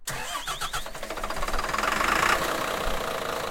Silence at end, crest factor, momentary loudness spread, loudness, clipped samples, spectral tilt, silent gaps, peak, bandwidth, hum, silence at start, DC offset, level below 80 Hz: 0 s; 20 dB; 10 LU; -27 LUFS; under 0.1%; -2 dB/octave; none; -8 dBFS; 17 kHz; none; 0 s; under 0.1%; -38 dBFS